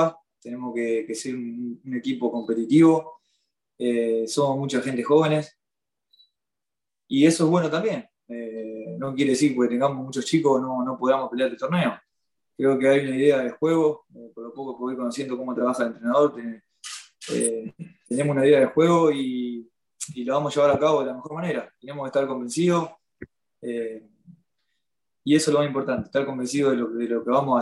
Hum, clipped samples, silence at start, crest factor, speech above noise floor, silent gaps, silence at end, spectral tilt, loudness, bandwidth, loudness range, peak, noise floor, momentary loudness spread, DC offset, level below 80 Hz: none; under 0.1%; 0 s; 18 dB; 67 dB; none; 0 s; -5.5 dB/octave; -23 LUFS; 12.5 kHz; 5 LU; -6 dBFS; -90 dBFS; 17 LU; under 0.1%; -68 dBFS